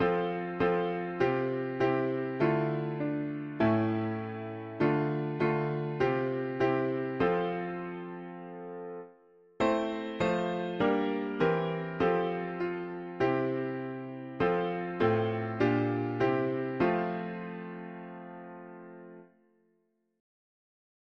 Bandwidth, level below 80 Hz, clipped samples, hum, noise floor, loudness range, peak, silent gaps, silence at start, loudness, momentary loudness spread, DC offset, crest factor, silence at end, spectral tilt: 7.4 kHz; -62 dBFS; under 0.1%; none; -75 dBFS; 5 LU; -14 dBFS; none; 0 s; -31 LUFS; 14 LU; under 0.1%; 18 dB; 1.95 s; -8.5 dB/octave